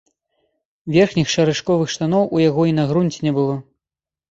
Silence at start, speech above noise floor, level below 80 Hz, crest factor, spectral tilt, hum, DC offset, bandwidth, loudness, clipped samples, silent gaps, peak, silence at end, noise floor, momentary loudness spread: 0.85 s; 73 dB; -52 dBFS; 16 dB; -6 dB/octave; none; under 0.1%; 8 kHz; -18 LUFS; under 0.1%; none; -2 dBFS; 0.7 s; -90 dBFS; 5 LU